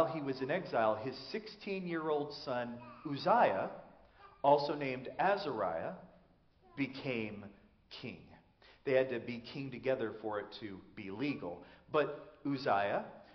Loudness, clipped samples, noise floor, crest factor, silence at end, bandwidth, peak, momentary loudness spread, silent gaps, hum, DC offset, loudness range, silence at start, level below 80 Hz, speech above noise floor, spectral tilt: -36 LUFS; under 0.1%; -67 dBFS; 22 dB; 0 s; 6.4 kHz; -14 dBFS; 16 LU; none; none; under 0.1%; 6 LU; 0 s; -72 dBFS; 31 dB; -4 dB/octave